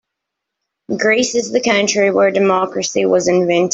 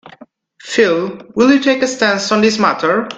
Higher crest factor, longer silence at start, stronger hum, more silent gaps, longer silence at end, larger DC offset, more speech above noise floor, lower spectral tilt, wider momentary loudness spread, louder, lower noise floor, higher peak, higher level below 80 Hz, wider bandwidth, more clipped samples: about the same, 14 dB vs 14 dB; first, 0.9 s vs 0.05 s; neither; neither; about the same, 0 s vs 0 s; neither; first, 65 dB vs 29 dB; about the same, -3.5 dB/octave vs -4 dB/octave; second, 4 LU vs 7 LU; about the same, -14 LUFS vs -14 LUFS; first, -79 dBFS vs -43 dBFS; about the same, -2 dBFS vs 0 dBFS; about the same, -58 dBFS vs -54 dBFS; second, 8 kHz vs 9.2 kHz; neither